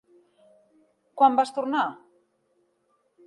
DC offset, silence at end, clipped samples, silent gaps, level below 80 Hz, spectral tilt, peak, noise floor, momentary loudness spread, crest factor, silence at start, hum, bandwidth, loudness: under 0.1%; 1.3 s; under 0.1%; none; -84 dBFS; -4 dB/octave; -6 dBFS; -70 dBFS; 11 LU; 22 dB; 1.15 s; none; 11.5 kHz; -23 LUFS